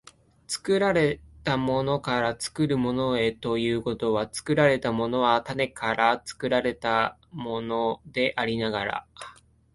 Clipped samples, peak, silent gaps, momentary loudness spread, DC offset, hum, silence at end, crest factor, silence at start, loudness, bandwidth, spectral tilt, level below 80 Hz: under 0.1%; -6 dBFS; none; 10 LU; under 0.1%; none; 0.4 s; 20 dB; 0.5 s; -26 LUFS; 11.5 kHz; -5 dB/octave; -54 dBFS